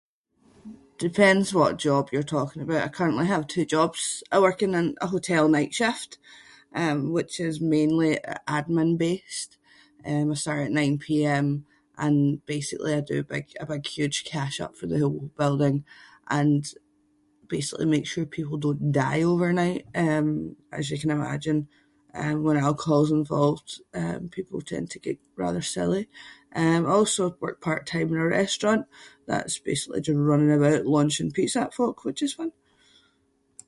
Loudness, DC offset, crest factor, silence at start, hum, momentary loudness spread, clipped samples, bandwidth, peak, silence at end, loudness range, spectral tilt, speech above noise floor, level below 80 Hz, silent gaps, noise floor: -25 LUFS; under 0.1%; 22 dB; 0.65 s; none; 12 LU; under 0.1%; 11.5 kHz; -4 dBFS; 1.15 s; 4 LU; -5.5 dB/octave; 43 dB; -60 dBFS; none; -68 dBFS